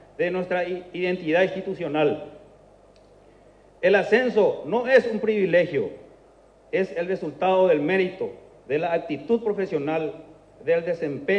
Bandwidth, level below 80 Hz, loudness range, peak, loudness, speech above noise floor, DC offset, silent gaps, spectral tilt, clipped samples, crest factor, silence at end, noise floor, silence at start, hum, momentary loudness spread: 8.4 kHz; -62 dBFS; 4 LU; -6 dBFS; -24 LUFS; 31 dB; under 0.1%; none; -7 dB/octave; under 0.1%; 18 dB; 0 s; -54 dBFS; 0.2 s; none; 11 LU